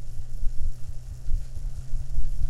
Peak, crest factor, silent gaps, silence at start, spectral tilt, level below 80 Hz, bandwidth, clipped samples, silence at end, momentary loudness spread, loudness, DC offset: -10 dBFS; 12 dB; none; 0 s; -6 dB/octave; -28 dBFS; 0.8 kHz; under 0.1%; 0 s; 6 LU; -37 LUFS; under 0.1%